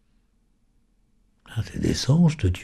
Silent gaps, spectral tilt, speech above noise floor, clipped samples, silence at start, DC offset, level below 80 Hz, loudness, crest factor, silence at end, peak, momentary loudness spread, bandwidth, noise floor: none; -6.5 dB/octave; 43 dB; under 0.1%; 1.5 s; under 0.1%; -42 dBFS; -23 LUFS; 16 dB; 0 s; -10 dBFS; 14 LU; 13 kHz; -64 dBFS